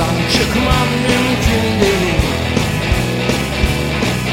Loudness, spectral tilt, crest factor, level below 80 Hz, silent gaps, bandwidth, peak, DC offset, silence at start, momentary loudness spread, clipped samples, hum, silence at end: -15 LUFS; -5 dB/octave; 14 dB; -24 dBFS; none; 16.5 kHz; 0 dBFS; under 0.1%; 0 s; 3 LU; under 0.1%; none; 0 s